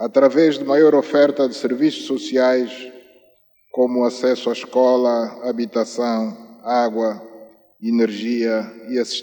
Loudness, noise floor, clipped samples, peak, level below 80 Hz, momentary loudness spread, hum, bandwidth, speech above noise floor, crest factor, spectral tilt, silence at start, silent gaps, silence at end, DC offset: -19 LUFS; -57 dBFS; under 0.1%; -2 dBFS; -78 dBFS; 11 LU; 50 Hz at -70 dBFS; 18 kHz; 39 dB; 16 dB; -5 dB/octave; 0 s; none; 0 s; under 0.1%